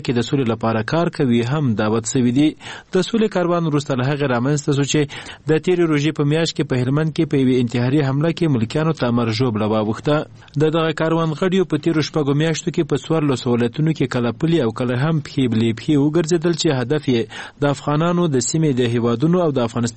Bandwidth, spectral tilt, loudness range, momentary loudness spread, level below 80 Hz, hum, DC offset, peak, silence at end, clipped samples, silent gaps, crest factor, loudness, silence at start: 8.8 kHz; -6 dB/octave; 1 LU; 3 LU; -50 dBFS; none; 0.2%; -2 dBFS; 0 s; under 0.1%; none; 16 dB; -19 LUFS; 0 s